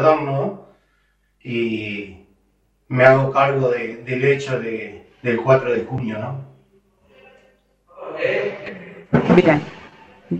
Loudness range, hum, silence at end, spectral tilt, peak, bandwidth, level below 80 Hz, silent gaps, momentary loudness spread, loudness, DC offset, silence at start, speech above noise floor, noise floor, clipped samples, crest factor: 7 LU; none; 0 s; -7.5 dB/octave; 0 dBFS; 8.2 kHz; -54 dBFS; none; 21 LU; -19 LUFS; under 0.1%; 0 s; 45 dB; -63 dBFS; under 0.1%; 20 dB